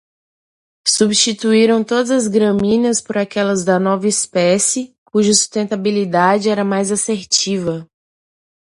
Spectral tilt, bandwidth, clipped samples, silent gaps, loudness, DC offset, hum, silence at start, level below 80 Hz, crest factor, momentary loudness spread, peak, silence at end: -3.5 dB/octave; 11.5 kHz; under 0.1%; 4.98-5.06 s; -15 LUFS; under 0.1%; none; 0.85 s; -56 dBFS; 16 dB; 6 LU; 0 dBFS; 0.8 s